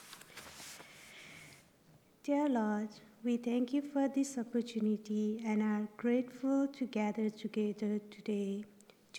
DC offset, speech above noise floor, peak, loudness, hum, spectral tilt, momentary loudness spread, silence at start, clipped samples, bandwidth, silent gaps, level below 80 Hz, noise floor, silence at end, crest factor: under 0.1%; 30 dB; -22 dBFS; -36 LUFS; none; -6 dB/octave; 17 LU; 0 s; under 0.1%; 17.5 kHz; none; -84 dBFS; -65 dBFS; 0 s; 14 dB